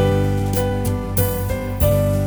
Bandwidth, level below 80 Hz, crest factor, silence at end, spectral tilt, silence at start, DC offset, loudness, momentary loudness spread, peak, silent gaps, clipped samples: over 20 kHz; -28 dBFS; 14 dB; 0 s; -6.5 dB/octave; 0 s; under 0.1%; -20 LUFS; 5 LU; -4 dBFS; none; under 0.1%